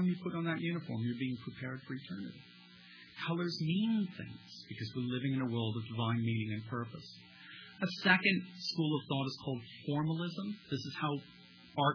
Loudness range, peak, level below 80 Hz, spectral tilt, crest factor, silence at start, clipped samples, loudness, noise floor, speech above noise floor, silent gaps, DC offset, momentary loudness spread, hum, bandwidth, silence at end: 5 LU; -14 dBFS; -76 dBFS; -4.5 dB/octave; 24 dB; 0 s; under 0.1%; -36 LUFS; -57 dBFS; 20 dB; none; under 0.1%; 18 LU; none; 5.4 kHz; 0 s